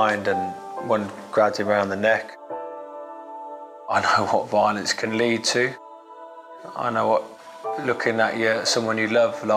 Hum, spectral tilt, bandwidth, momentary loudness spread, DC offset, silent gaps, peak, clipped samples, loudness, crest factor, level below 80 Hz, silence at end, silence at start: none; -3.5 dB/octave; 14.5 kHz; 18 LU; under 0.1%; none; -6 dBFS; under 0.1%; -22 LUFS; 18 dB; -72 dBFS; 0 s; 0 s